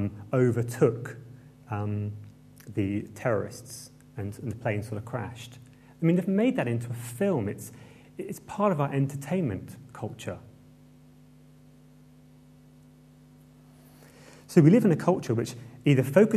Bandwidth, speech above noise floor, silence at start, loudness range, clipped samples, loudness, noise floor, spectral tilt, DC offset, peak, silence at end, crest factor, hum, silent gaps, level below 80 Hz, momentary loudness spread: 14 kHz; 28 dB; 0 s; 9 LU; under 0.1%; -28 LUFS; -54 dBFS; -7.5 dB/octave; under 0.1%; -6 dBFS; 0 s; 22 dB; none; none; -64 dBFS; 20 LU